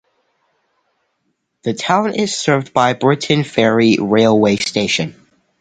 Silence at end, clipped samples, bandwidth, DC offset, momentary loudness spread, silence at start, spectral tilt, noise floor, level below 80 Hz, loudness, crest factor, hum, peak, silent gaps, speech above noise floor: 0.5 s; under 0.1%; 9.4 kHz; under 0.1%; 7 LU; 1.65 s; -5 dB/octave; -69 dBFS; -54 dBFS; -15 LUFS; 16 dB; none; 0 dBFS; none; 55 dB